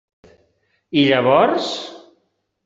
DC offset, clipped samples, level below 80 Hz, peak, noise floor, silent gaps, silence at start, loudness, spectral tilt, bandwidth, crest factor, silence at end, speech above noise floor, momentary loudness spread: under 0.1%; under 0.1%; -62 dBFS; -2 dBFS; -68 dBFS; none; 0.9 s; -17 LUFS; -5.5 dB/octave; 7.8 kHz; 18 dB; 0.7 s; 52 dB; 14 LU